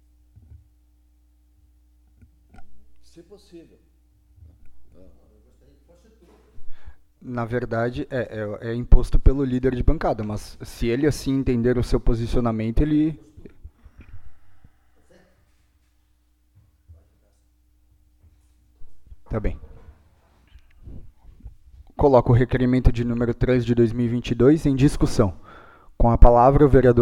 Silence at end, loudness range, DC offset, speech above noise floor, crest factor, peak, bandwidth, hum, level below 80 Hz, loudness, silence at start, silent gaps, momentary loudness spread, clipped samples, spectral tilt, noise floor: 0 s; 18 LU; under 0.1%; 44 dB; 22 dB; 0 dBFS; 11.5 kHz; none; -26 dBFS; -21 LUFS; 2.6 s; none; 15 LU; under 0.1%; -8 dB/octave; -62 dBFS